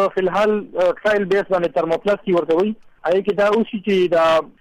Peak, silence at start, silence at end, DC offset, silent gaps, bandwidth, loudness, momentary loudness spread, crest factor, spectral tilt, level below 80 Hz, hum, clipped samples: -10 dBFS; 0 s; 0.1 s; under 0.1%; none; 11.5 kHz; -18 LUFS; 4 LU; 8 dB; -6.5 dB/octave; -54 dBFS; none; under 0.1%